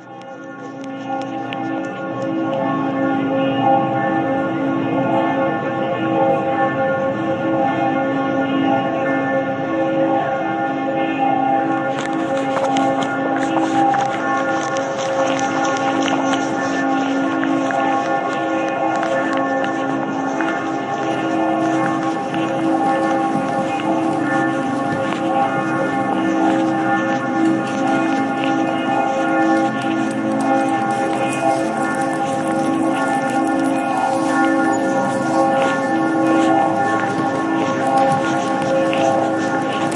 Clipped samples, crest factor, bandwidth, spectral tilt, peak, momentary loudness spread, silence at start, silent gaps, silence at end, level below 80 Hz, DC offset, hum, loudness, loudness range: under 0.1%; 14 dB; 11.5 kHz; -5.5 dB/octave; -4 dBFS; 4 LU; 0 s; none; 0 s; -64 dBFS; under 0.1%; none; -18 LUFS; 2 LU